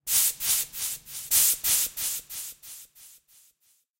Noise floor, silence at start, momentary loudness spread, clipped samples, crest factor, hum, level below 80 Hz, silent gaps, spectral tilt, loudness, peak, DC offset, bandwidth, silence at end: -67 dBFS; 0.05 s; 19 LU; under 0.1%; 24 dB; none; -60 dBFS; none; 2.5 dB/octave; -23 LUFS; -6 dBFS; under 0.1%; 17 kHz; 0.9 s